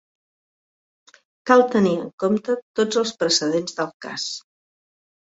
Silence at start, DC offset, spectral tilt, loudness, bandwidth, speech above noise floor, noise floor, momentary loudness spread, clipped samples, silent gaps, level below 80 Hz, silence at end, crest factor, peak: 1.45 s; under 0.1%; -4 dB/octave; -21 LUFS; 8.2 kHz; over 69 dB; under -90 dBFS; 12 LU; under 0.1%; 2.13-2.18 s, 2.62-2.74 s, 3.94-4.00 s; -66 dBFS; 0.85 s; 22 dB; -2 dBFS